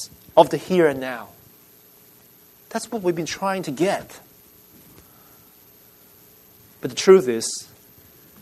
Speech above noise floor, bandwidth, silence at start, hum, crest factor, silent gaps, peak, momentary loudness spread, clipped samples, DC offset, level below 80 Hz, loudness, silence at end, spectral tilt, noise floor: 32 dB; 13.5 kHz; 0 s; none; 24 dB; none; 0 dBFS; 19 LU; under 0.1%; under 0.1%; -64 dBFS; -21 LUFS; 0.75 s; -4.5 dB/octave; -51 dBFS